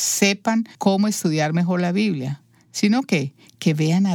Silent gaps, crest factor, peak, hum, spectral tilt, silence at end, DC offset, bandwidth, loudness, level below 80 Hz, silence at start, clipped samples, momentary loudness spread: none; 18 dB; -4 dBFS; none; -5 dB/octave; 0 s; under 0.1%; 18.5 kHz; -21 LUFS; -72 dBFS; 0 s; under 0.1%; 10 LU